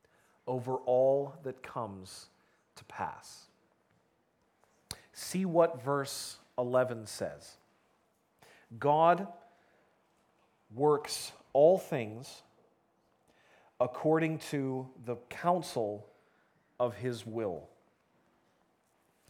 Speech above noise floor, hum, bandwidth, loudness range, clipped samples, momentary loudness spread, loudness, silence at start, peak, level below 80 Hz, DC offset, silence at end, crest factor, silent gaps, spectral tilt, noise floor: 42 dB; none; 17.5 kHz; 9 LU; under 0.1%; 21 LU; -32 LUFS; 0.45 s; -12 dBFS; -76 dBFS; under 0.1%; 1.65 s; 22 dB; none; -5.5 dB/octave; -74 dBFS